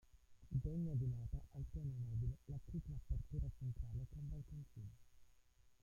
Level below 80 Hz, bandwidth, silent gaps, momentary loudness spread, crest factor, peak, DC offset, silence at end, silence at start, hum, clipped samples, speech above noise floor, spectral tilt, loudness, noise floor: -52 dBFS; 7.2 kHz; none; 10 LU; 16 dB; -30 dBFS; under 0.1%; 0.1 s; 0.15 s; none; under 0.1%; 25 dB; -10 dB/octave; -48 LUFS; -70 dBFS